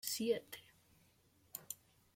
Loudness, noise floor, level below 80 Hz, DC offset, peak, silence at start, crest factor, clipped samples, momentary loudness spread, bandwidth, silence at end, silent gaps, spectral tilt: -43 LUFS; -72 dBFS; -82 dBFS; under 0.1%; -24 dBFS; 0.05 s; 22 dB; under 0.1%; 16 LU; 16.5 kHz; 0.4 s; none; -2.5 dB/octave